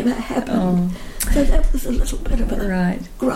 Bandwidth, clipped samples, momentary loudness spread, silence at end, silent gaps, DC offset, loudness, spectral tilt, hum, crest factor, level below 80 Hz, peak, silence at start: 16.5 kHz; under 0.1%; 6 LU; 0 s; none; under 0.1%; -21 LUFS; -6 dB/octave; none; 14 dB; -20 dBFS; -4 dBFS; 0 s